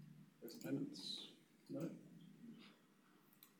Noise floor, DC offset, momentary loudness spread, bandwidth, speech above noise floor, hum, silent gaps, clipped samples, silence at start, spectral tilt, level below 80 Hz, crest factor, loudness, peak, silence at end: -72 dBFS; under 0.1%; 18 LU; 19 kHz; 24 dB; none; none; under 0.1%; 0 s; -5 dB/octave; under -90 dBFS; 20 dB; -51 LUFS; -34 dBFS; 0 s